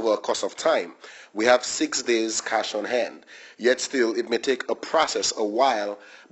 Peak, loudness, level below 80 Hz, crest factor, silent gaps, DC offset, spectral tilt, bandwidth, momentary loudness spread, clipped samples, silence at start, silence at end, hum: -4 dBFS; -24 LUFS; -68 dBFS; 20 dB; none; under 0.1%; -1.5 dB/octave; 8.4 kHz; 11 LU; under 0.1%; 0 s; 0.15 s; none